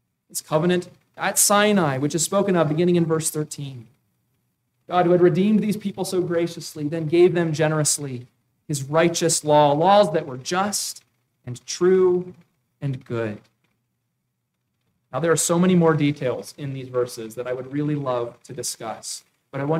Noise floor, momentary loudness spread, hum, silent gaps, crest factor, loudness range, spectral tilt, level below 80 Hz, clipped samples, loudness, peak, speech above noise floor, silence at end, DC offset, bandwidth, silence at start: -76 dBFS; 15 LU; none; none; 18 dB; 6 LU; -4.5 dB/octave; -66 dBFS; under 0.1%; -21 LUFS; -4 dBFS; 55 dB; 0 s; under 0.1%; 16 kHz; 0.35 s